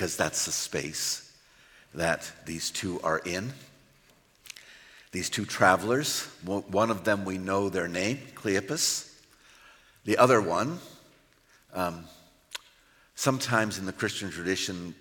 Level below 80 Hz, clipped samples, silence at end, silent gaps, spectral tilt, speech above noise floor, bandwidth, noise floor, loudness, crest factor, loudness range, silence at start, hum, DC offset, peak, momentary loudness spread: -66 dBFS; under 0.1%; 0.05 s; none; -3.5 dB/octave; 34 dB; 17 kHz; -62 dBFS; -28 LUFS; 24 dB; 6 LU; 0 s; none; under 0.1%; -6 dBFS; 19 LU